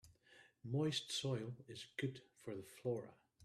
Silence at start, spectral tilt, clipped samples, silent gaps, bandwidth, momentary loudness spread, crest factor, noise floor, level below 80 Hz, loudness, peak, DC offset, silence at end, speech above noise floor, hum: 0.05 s; -5 dB/octave; under 0.1%; none; 14 kHz; 14 LU; 18 dB; -69 dBFS; -80 dBFS; -44 LUFS; -28 dBFS; under 0.1%; 0 s; 25 dB; none